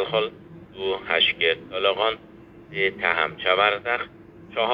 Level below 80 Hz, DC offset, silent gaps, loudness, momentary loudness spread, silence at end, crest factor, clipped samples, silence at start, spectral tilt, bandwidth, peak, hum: -60 dBFS; under 0.1%; none; -23 LUFS; 14 LU; 0 s; 20 dB; under 0.1%; 0 s; -6 dB/octave; 5.6 kHz; -4 dBFS; none